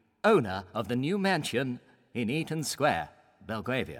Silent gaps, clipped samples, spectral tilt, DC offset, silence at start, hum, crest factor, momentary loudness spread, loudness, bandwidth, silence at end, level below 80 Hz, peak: none; under 0.1%; -5 dB/octave; under 0.1%; 0.25 s; none; 18 dB; 13 LU; -30 LUFS; 17 kHz; 0 s; -64 dBFS; -12 dBFS